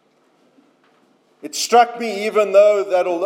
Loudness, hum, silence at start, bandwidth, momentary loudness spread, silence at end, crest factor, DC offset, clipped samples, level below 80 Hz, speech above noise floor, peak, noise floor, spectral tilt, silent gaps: -16 LUFS; none; 1.45 s; 16.5 kHz; 12 LU; 0 s; 16 dB; under 0.1%; under 0.1%; under -90 dBFS; 42 dB; -2 dBFS; -58 dBFS; -2.5 dB/octave; none